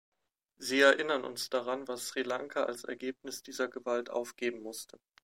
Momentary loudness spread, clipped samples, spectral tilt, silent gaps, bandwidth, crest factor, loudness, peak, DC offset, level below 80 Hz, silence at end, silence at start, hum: 17 LU; under 0.1%; -2 dB/octave; none; 16 kHz; 22 dB; -33 LUFS; -12 dBFS; under 0.1%; -84 dBFS; 0.4 s; 0.6 s; none